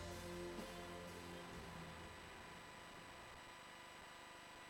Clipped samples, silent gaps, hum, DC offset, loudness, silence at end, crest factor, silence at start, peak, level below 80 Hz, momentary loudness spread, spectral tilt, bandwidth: under 0.1%; none; none; under 0.1%; -54 LUFS; 0 s; 16 dB; 0 s; -38 dBFS; -68 dBFS; 6 LU; -4 dB/octave; 19 kHz